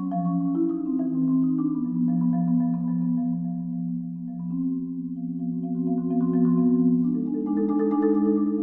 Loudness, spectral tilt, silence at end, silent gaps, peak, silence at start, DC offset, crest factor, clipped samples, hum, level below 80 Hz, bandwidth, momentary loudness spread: -25 LUFS; -14 dB/octave; 0 s; none; -12 dBFS; 0 s; under 0.1%; 12 dB; under 0.1%; none; -64 dBFS; 1.9 kHz; 9 LU